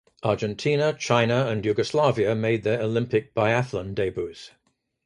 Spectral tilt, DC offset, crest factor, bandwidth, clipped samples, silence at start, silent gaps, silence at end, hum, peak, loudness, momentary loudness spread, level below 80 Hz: -6 dB/octave; under 0.1%; 20 dB; 11 kHz; under 0.1%; 0.25 s; none; 0.6 s; none; -6 dBFS; -24 LUFS; 7 LU; -54 dBFS